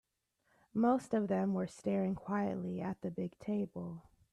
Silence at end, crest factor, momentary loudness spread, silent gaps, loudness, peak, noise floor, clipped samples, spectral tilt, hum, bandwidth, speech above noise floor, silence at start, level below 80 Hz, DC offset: 0.35 s; 18 dB; 10 LU; none; -37 LUFS; -20 dBFS; -79 dBFS; under 0.1%; -8 dB/octave; none; 11 kHz; 44 dB; 0.75 s; -70 dBFS; under 0.1%